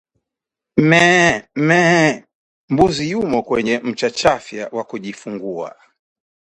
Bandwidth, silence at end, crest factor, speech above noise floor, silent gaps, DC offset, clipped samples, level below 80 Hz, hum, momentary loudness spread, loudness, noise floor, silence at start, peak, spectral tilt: 11.5 kHz; 0.85 s; 18 dB; 68 dB; 2.35-2.68 s; under 0.1%; under 0.1%; -48 dBFS; none; 17 LU; -16 LUFS; -84 dBFS; 0.75 s; 0 dBFS; -5 dB/octave